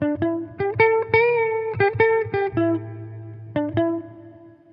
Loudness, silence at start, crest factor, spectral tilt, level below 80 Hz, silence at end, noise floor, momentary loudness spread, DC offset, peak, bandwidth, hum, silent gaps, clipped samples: -21 LUFS; 0 s; 18 dB; -10 dB/octave; -58 dBFS; 0.25 s; -45 dBFS; 18 LU; under 0.1%; -4 dBFS; 5.4 kHz; none; none; under 0.1%